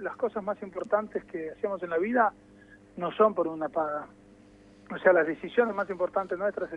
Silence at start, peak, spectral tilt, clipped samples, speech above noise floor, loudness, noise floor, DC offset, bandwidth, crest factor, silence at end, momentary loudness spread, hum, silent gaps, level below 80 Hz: 0 s; -8 dBFS; -7.5 dB/octave; under 0.1%; 26 dB; -29 LUFS; -55 dBFS; under 0.1%; 8 kHz; 20 dB; 0 s; 12 LU; none; none; -66 dBFS